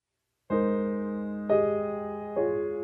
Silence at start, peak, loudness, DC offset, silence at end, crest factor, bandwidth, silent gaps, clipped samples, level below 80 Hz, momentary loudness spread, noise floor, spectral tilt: 0.5 s; -12 dBFS; -29 LUFS; under 0.1%; 0 s; 16 dB; 4 kHz; none; under 0.1%; -62 dBFS; 8 LU; -71 dBFS; -10.5 dB/octave